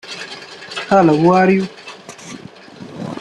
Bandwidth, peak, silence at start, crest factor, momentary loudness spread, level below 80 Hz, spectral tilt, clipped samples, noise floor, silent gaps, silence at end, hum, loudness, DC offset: 11 kHz; -2 dBFS; 0.05 s; 16 dB; 23 LU; -58 dBFS; -6.5 dB/octave; under 0.1%; -36 dBFS; none; 0 s; none; -14 LUFS; under 0.1%